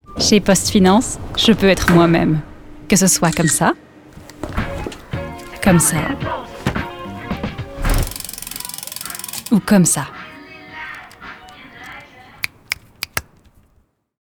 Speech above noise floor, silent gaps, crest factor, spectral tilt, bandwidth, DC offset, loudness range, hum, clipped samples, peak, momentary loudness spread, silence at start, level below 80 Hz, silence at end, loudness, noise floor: 45 dB; none; 18 dB; -4 dB/octave; over 20 kHz; under 0.1%; 15 LU; none; under 0.1%; -2 dBFS; 22 LU; 0.1 s; -32 dBFS; 1.05 s; -17 LUFS; -59 dBFS